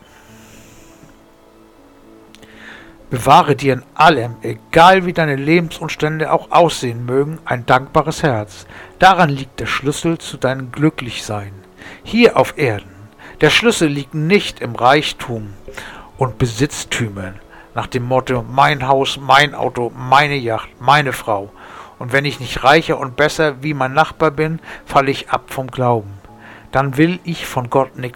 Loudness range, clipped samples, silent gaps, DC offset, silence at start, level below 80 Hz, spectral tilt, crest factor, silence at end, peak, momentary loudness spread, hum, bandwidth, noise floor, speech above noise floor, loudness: 5 LU; under 0.1%; none; under 0.1%; 0.55 s; -42 dBFS; -5 dB/octave; 16 dB; 0.05 s; 0 dBFS; 15 LU; none; 19 kHz; -46 dBFS; 30 dB; -15 LUFS